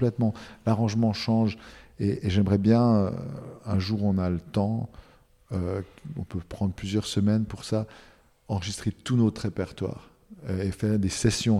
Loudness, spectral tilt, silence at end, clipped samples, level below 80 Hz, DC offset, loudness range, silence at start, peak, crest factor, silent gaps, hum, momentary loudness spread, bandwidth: -27 LUFS; -6.5 dB/octave; 0 s; under 0.1%; -50 dBFS; under 0.1%; 5 LU; 0 s; -8 dBFS; 18 dB; none; none; 13 LU; 12.5 kHz